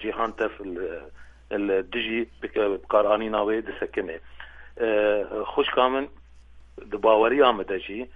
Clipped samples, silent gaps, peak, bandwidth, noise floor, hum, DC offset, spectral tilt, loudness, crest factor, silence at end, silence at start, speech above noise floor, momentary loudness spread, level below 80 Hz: under 0.1%; none; -4 dBFS; 5.8 kHz; -48 dBFS; none; under 0.1%; -6.5 dB/octave; -25 LUFS; 22 dB; 0 s; 0 s; 24 dB; 16 LU; -52 dBFS